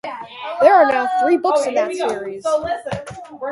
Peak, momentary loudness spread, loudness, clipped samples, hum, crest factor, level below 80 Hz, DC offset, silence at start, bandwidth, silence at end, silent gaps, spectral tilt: 0 dBFS; 17 LU; -17 LUFS; under 0.1%; none; 18 dB; -54 dBFS; under 0.1%; 0.05 s; 11.5 kHz; 0 s; none; -4.5 dB/octave